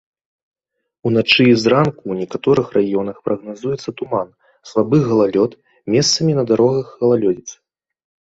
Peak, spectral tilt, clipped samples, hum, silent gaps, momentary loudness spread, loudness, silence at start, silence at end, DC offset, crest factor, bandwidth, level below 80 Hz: 0 dBFS; -5 dB/octave; under 0.1%; none; none; 12 LU; -17 LUFS; 1.05 s; 0.75 s; under 0.1%; 18 dB; 8 kHz; -54 dBFS